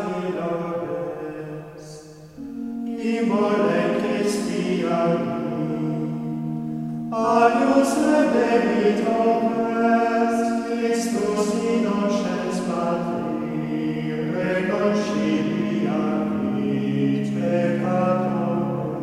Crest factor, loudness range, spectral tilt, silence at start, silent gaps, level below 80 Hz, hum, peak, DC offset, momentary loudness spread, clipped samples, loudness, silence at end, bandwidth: 16 dB; 5 LU; -6.5 dB/octave; 0 s; none; -58 dBFS; none; -6 dBFS; under 0.1%; 10 LU; under 0.1%; -22 LUFS; 0 s; 13.5 kHz